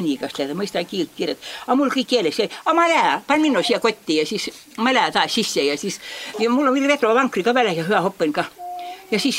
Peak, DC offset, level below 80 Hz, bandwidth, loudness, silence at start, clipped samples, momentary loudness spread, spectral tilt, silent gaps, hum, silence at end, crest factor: -2 dBFS; under 0.1%; -66 dBFS; 16 kHz; -20 LUFS; 0 s; under 0.1%; 10 LU; -3.5 dB/octave; none; none; 0 s; 18 dB